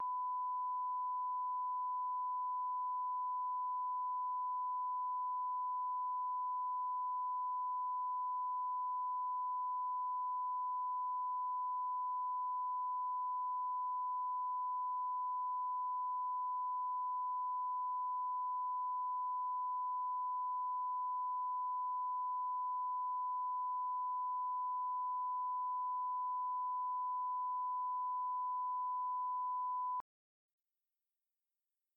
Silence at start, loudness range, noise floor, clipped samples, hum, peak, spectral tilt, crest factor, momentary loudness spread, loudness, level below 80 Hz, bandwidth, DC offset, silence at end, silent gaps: 0 s; 0 LU; under -90 dBFS; under 0.1%; none; -36 dBFS; -2.5 dB/octave; 4 dB; 0 LU; -39 LUFS; under -90 dBFS; 1.3 kHz; under 0.1%; 1.95 s; none